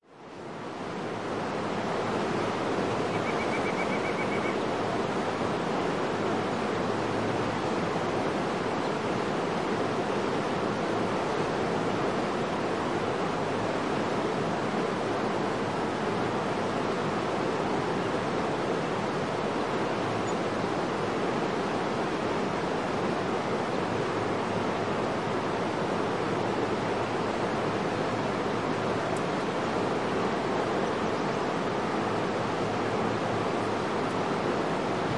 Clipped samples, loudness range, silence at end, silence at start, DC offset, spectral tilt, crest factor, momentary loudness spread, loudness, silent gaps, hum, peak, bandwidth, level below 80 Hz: under 0.1%; 0 LU; 0 s; 0.05 s; 0.2%; -5.5 dB/octave; 14 dB; 1 LU; -29 LUFS; none; none; -16 dBFS; 11.5 kHz; -58 dBFS